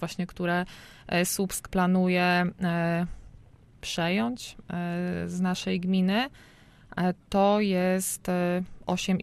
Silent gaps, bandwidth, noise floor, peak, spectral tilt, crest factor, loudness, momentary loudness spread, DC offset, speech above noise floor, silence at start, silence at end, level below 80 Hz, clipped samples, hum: none; 14.5 kHz; -53 dBFS; -12 dBFS; -5 dB/octave; 16 dB; -27 LUFS; 11 LU; under 0.1%; 26 dB; 0 s; 0 s; -52 dBFS; under 0.1%; none